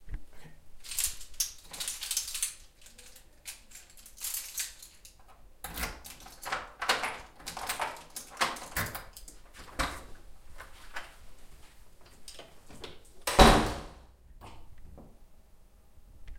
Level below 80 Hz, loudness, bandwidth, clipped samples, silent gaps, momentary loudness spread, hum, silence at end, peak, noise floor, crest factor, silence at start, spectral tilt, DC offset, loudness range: -42 dBFS; -31 LUFS; 16.5 kHz; under 0.1%; none; 22 LU; none; 0 s; -4 dBFS; -56 dBFS; 30 dB; 0 s; -3 dB/octave; under 0.1%; 14 LU